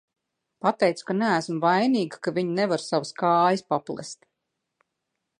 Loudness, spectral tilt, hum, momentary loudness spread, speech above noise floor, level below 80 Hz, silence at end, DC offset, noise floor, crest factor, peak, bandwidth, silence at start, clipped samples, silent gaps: -24 LUFS; -5.5 dB/octave; none; 9 LU; 57 dB; -76 dBFS; 1.25 s; under 0.1%; -81 dBFS; 20 dB; -6 dBFS; 11 kHz; 0.65 s; under 0.1%; none